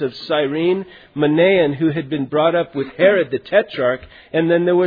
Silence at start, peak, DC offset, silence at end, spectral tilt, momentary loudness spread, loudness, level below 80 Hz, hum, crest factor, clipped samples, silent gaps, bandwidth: 0 s; -2 dBFS; under 0.1%; 0 s; -9 dB/octave; 9 LU; -18 LUFS; -54 dBFS; none; 16 dB; under 0.1%; none; 5 kHz